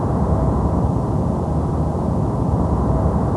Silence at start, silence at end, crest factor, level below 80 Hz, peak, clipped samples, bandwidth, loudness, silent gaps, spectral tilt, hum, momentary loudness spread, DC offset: 0 s; 0 s; 12 dB; -24 dBFS; -6 dBFS; under 0.1%; 11 kHz; -20 LUFS; none; -10 dB/octave; none; 2 LU; 0.2%